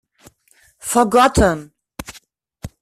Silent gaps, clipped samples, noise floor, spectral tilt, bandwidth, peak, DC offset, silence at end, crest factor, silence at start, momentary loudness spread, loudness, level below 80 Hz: none; under 0.1%; -56 dBFS; -4.5 dB/octave; 15 kHz; -2 dBFS; under 0.1%; 0.15 s; 18 dB; 0.85 s; 24 LU; -15 LUFS; -34 dBFS